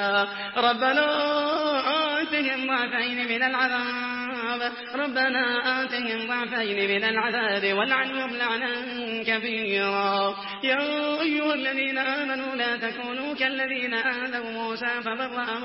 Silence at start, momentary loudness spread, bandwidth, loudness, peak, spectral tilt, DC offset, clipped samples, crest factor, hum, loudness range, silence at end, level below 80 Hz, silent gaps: 0 s; 6 LU; 5.8 kHz; -25 LUFS; -8 dBFS; -7.5 dB/octave; under 0.1%; under 0.1%; 18 dB; none; 2 LU; 0 s; -70 dBFS; none